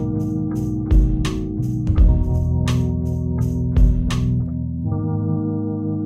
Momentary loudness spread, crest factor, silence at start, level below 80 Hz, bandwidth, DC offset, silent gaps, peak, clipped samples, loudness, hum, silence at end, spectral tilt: 6 LU; 14 dB; 0 s; -22 dBFS; 11 kHz; under 0.1%; none; -4 dBFS; under 0.1%; -21 LUFS; none; 0 s; -8 dB/octave